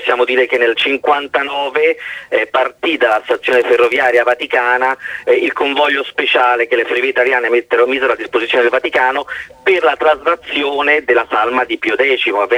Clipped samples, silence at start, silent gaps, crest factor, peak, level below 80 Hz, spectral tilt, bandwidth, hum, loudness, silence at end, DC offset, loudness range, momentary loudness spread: under 0.1%; 0 s; none; 14 dB; 0 dBFS; -56 dBFS; -3 dB/octave; 12 kHz; none; -13 LUFS; 0 s; under 0.1%; 1 LU; 5 LU